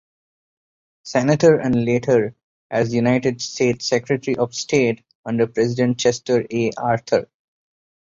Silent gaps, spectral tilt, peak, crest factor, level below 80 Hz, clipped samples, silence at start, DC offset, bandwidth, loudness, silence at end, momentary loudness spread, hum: 2.43-2.70 s, 5.15-5.24 s; -5.5 dB/octave; -2 dBFS; 18 dB; -56 dBFS; under 0.1%; 1.05 s; under 0.1%; 7.8 kHz; -19 LUFS; 0.95 s; 7 LU; none